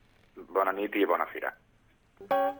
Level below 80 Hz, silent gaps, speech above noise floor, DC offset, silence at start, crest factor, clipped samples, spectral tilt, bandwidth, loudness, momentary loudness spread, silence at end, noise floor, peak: -68 dBFS; none; 35 dB; under 0.1%; 0.35 s; 20 dB; under 0.1%; -6 dB/octave; 19 kHz; -30 LUFS; 8 LU; 0 s; -64 dBFS; -12 dBFS